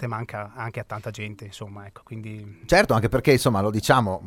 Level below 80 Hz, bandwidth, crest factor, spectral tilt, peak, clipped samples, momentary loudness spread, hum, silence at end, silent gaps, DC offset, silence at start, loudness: -44 dBFS; 16.5 kHz; 22 dB; -5.5 dB/octave; -2 dBFS; under 0.1%; 19 LU; none; 0 s; none; under 0.1%; 0 s; -22 LUFS